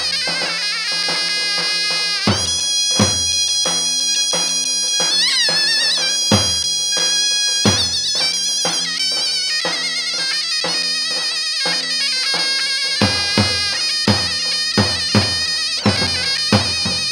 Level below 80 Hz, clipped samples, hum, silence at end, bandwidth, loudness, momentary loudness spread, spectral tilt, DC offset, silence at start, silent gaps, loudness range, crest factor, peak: -50 dBFS; under 0.1%; none; 0 s; 16.5 kHz; -15 LUFS; 4 LU; -1.5 dB/octave; under 0.1%; 0 s; none; 3 LU; 16 dB; -2 dBFS